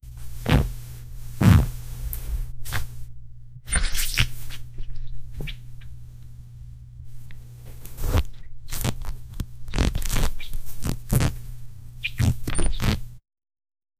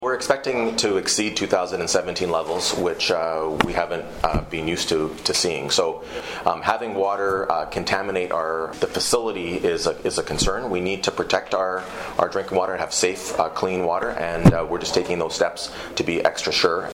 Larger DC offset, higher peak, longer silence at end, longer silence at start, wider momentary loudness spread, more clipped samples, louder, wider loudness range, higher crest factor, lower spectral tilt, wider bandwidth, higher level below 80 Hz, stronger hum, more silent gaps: neither; first, 0 dBFS vs -4 dBFS; first, 0.8 s vs 0 s; about the same, 0.05 s vs 0 s; first, 21 LU vs 5 LU; neither; second, -26 LUFS vs -22 LUFS; first, 10 LU vs 2 LU; about the same, 24 dB vs 20 dB; first, -5 dB/octave vs -3.5 dB/octave; about the same, 16 kHz vs 16.5 kHz; first, -30 dBFS vs -40 dBFS; neither; neither